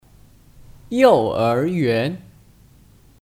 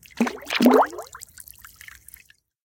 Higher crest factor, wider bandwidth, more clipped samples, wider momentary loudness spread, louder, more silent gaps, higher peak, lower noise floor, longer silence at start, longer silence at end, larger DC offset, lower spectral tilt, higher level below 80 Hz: about the same, 20 dB vs 22 dB; about the same, 15.5 kHz vs 17 kHz; neither; second, 12 LU vs 25 LU; about the same, -18 LUFS vs -20 LUFS; neither; about the same, -2 dBFS vs -2 dBFS; about the same, -50 dBFS vs -52 dBFS; first, 0.9 s vs 0.2 s; second, 1.05 s vs 1.5 s; neither; first, -7 dB/octave vs -4 dB/octave; first, -52 dBFS vs -60 dBFS